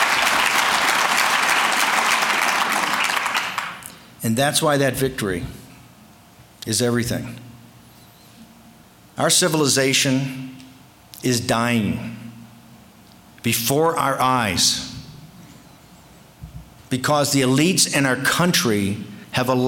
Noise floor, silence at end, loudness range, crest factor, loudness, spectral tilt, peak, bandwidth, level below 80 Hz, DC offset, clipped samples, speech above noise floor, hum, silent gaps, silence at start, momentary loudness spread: -48 dBFS; 0 s; 7 LU; 16 dB; -19 LUFS; -3 dB/octave; -6 dBFS; 17 kHz; -52 dBFS; under 0.1%; under 0.1%; 29 dB; none; none; 0 s; 17 LU